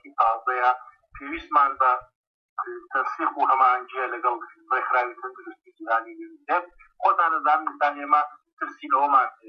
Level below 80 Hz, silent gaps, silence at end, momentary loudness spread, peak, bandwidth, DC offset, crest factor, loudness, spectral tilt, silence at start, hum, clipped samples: -64 dBFS; 2.15-2.57 s, 8.53-8.57 s; 0 s; 15 LU; -8 dBFS; 6.2 kHz; under 0.1%; 16 dB; -23 LUFS; -4.5 dB/octave; 0.05 s; none; under 0.1%